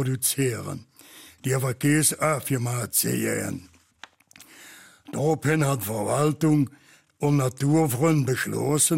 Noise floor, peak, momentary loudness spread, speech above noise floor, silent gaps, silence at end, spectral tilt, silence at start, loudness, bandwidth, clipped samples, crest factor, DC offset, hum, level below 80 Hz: -52 dBFS; -8 dBFS; 12 LU; 29 dB; none; 0 s; -5 dB/octave; 0 s; -24 LUFS; 16.5 kHz; under 0.1%; 18 dB; under 0.1%; none; -62 dBFS